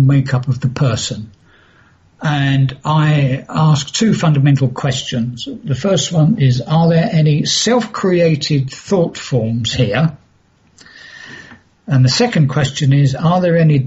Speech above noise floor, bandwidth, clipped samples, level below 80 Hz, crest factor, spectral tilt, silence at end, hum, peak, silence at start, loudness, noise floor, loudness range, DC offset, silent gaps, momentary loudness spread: 40 dB; 8 kHz; under 0.1%; -46 dBFS; 12 dB; -6 dB/octave; 0 s; none; -4 dBFS; 0 s; -14 LUFS; -53 dBFS; 4 LU; under 0.1%; none; 8 LU